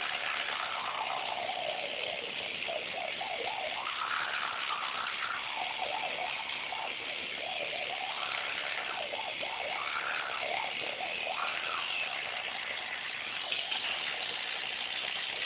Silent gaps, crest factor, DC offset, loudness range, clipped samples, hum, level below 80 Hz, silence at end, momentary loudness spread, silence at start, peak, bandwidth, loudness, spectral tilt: none; 18 dB; under 0.1%; 1 LU; under 0.1%; none; -72 dBFS; 0 s; 3 LU; 0 s; -18 dBFS; 4 kHz; -34 LUFS; 2.5 dB/octave